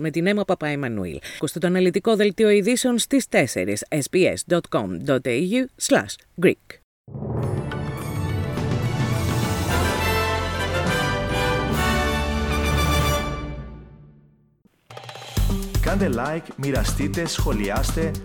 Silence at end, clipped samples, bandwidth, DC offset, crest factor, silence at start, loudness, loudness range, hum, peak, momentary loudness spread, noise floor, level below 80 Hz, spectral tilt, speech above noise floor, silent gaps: 0 s; under 0.1%; 19 kHz; under 0.1%; 18 dB; 0 s; -22 LUFS; 6 LU; none; -4 dBFS; 9 LU; -60 dBFS; -32 dBFS; -5 dB/octave; 39 dB; 6.84-7.04 s